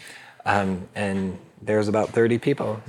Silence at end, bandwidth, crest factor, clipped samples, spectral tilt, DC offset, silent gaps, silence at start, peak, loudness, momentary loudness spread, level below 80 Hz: 0.05 s; 12.5 kHz; 18 dB; under 0.1%; -6.5 dB/octave; under 0.1%; none; 0 s; -6 dBFS; -24 LUFS; 10 LU; -66 dBFS